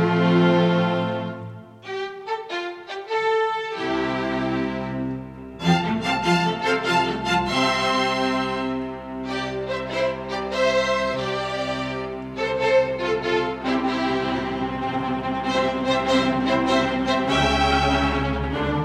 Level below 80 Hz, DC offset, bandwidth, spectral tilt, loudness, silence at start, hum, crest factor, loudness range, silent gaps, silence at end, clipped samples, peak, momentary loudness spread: -40 dBFS; under 0.1%; 12 kHz; -5.5 dB/octave; -23 LUFS; 0 s; none; 16 dB; 5 LU; none; 0 s; under 0.1%; -6 dBFS; 10 LU